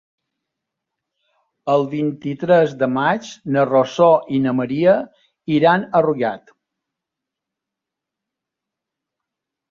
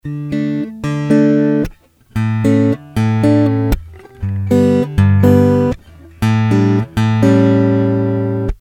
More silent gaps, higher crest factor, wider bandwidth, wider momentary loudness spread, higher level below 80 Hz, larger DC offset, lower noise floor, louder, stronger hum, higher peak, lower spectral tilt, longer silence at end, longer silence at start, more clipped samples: neither; about the same, 18 dB vs 14 dB; second, 7.4 kHz vs 14 kHz; about the same, 10 LU vs 10 LU; second, -62 dBFS vs -32 dBFS; neither; first, -84 dBFS vs -33 dBFS; second, -18 LUFS vs -14 LUFS; neither; about the same, -2 dBFS vs 0 dBFS; second, -7 dB/octave vs -8.5 dB/octave; first, 3.35 s vs 0.05 s; first, 1.65 s vs 0.05 s; neither